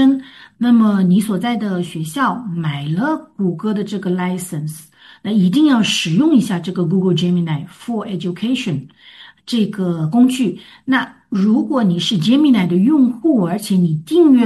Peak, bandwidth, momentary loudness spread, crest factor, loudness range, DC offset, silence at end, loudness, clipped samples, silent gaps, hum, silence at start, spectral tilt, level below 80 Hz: -2 dBFS; 12.5 kHz; 11 LU; 14 dB; 5 LU; under 0.1%; 0 s; -16 LUFS; under 0.1%; none; none; 0 s; -6 dB/octave; -60 dBFS